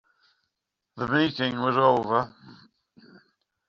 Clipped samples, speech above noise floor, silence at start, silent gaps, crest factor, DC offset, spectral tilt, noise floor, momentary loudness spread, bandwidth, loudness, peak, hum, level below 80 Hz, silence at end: under 0.1%; 59 dB; 0.95 s; none; 22 dB; under 0.1%; -3.5 dB/octave; -83 dBFS; 10 LU; 7.2 kHz; -24 LUFS; -6 dBFS; none; -64 dBFS; 1.15 s